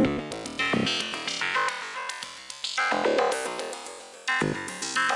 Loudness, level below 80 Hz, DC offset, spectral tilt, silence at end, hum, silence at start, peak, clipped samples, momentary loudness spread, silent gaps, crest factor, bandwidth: -28 LUFS; -60 dBFS; under 0.1%; -3 dB/octave; 0 s; none; 0 s; -10 dBFS; under 0.1%; 10 LU; none; 20 dB; 11.5 kHz